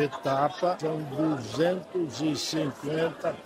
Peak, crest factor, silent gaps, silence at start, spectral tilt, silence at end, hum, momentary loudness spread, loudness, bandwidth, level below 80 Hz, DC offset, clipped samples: -12 dBFS; 16 dB; none; 0 s; -5.5 dB/octave; 0 s; none; 4 LU; -29 LUFS; 16 kHz; -68 dBFS; under 0.1%; under 0.1%